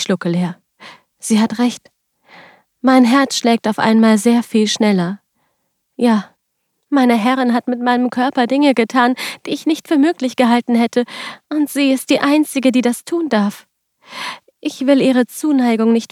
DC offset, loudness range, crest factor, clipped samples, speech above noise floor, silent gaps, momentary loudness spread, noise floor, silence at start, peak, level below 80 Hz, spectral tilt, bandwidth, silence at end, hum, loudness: under 0.1%; 3 LU; 14 dB; under 0.1%; 56 dB; none; 11 LU; -70 dBFS; 0 s; 0 dBFS; -70 dBFS; -5 dB/octave; 15 kHz; 0.05 s; none; -15 LUFS